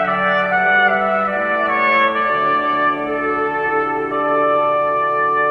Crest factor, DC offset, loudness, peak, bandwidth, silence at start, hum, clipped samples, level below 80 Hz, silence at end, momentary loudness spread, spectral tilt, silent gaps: 14 dB; under 0.1%; -16 LUFS; -2 dBFS; 6.4 kHz; 0 s; none; under 0.1%; -52 dBFS; 0 s; 5 LU; -6.5 dB/octave; none